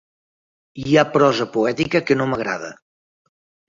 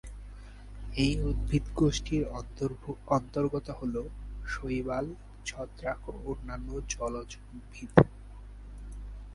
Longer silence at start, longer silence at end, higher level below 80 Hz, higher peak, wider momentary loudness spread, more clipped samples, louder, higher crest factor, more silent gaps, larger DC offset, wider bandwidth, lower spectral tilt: first, 0.75 s vs 0.05 s; first, 0.95 s vs 0 s; second, -56 dBFS vs -40 dBFS; about the same, -2 dBFS vs 0 dBFS; second, 12 LU vs 20 LU; neither; first, -19 LUFS vs -32 LUFS; second, 20 dB vs 32 dB; neither; neither; second, 7.6 kHz vs 11.5 kHz; about the same, -6 dB/octave vs -6 dB/octave